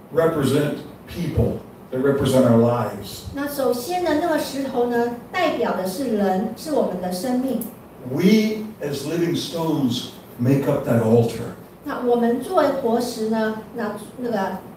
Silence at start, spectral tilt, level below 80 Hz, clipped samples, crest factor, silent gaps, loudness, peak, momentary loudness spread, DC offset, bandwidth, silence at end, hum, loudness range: 0 s; -6.5 dB/octave; -48 dBFS; under 0.1%; 18 dB; none; -22 LUFS; -2 dBFS; 12 LU; under 0.1%; 16 kHz; 0 s; none; 2 LU